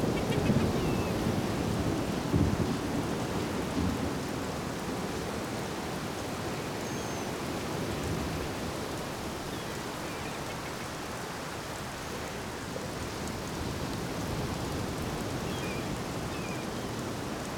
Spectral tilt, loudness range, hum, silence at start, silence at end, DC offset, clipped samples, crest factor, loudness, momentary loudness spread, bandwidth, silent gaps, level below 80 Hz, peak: -5 dB/octave; 6 LU; none; 0 s; 0 s; under 0.1%; under 0.1%; 20 dB; -34 LUFS; 8 LU; over 20 kHz; none; -46 dBFS; -14 dBFS